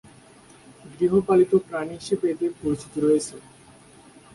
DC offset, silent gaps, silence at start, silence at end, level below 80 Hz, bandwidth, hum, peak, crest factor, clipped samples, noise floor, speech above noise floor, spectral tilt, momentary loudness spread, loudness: under 0.1%; none; 0.85 s; 0.95 s; -58 dBFS; 11.5 kHz; none; -8 dBFS; 16 dB; under 0.1%; -50 dBFS; 28 dB; -6.5 dB/octave; 11 LU; -23 LUFS